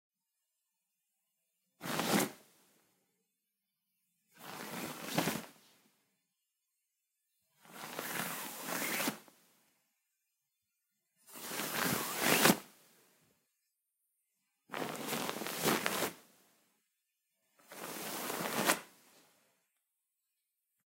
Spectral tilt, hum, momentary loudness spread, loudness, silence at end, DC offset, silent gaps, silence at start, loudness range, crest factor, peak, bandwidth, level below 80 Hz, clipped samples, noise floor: -2.5 dB/octave; none; 17 LU; -35 LUFS; 1.95 s; under 0.1%; none; 1.8 s; 9 LU; 34 dB; -8 dBFS; 16 kHz; -82 dBFS; under 0.1%; -87 dBFS